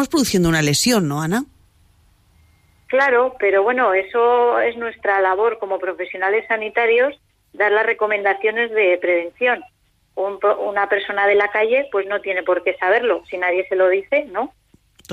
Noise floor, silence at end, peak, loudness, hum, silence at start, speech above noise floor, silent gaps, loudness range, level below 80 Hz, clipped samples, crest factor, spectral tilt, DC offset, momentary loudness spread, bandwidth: -55 dBFS; 0 s; -6 dBFS; -18 LUFS; none; 0 s; 37 dB; none; 2 LU; -50 dBFS; under 0.1%; 14 dB; -4 dB/octave; under 0.1%; 8 LU; 15.5 kHz